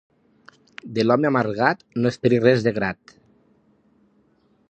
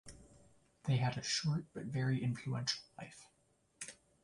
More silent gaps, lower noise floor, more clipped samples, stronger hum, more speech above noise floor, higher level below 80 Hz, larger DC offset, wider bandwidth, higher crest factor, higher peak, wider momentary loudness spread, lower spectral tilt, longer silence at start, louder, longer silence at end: neither; second, -62 dBFS vs -75 dBFS; neither; neither; first, 41 dB vs 37 dB; first, -60 dBFS vs -68 dBFS; neither; second, 8.6 kHz vs 11.5 kHz; about the same, 22 dB vs 20 dB; first, -2 dBFS vs -20 dBFS; second, 12 LU vs 17 LU; first, -7 dB/octave vs -4.5 dB/octave; first, 0.85 s vs 0.05 s; first, -21 LUFS vs -38 LUFS; first, 1.75 s vs 0.3 s